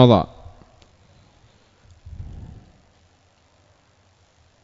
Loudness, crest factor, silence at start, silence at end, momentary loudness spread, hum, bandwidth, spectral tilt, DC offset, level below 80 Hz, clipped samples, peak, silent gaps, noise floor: -21 LUFS; 24 dB; 0 s; 4.4 s; 30 LU; none; 7.2 kHz; -7 dB/octave; under 0.1%; -48 dBFS; under 0.1%; 0 dBFS; none; -59 dBFS